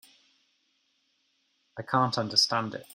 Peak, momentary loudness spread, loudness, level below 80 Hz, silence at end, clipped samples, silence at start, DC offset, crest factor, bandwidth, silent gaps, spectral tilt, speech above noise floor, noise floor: -8 dBFS; 19 LU; -26 LUFS; -72 dBFS; 0.1 s; under 0.1%; 1.75 s; under 0.1%; 24 dB; 16 kHz; none; -3.5 dB/octave; 45 dB; -73 dBFS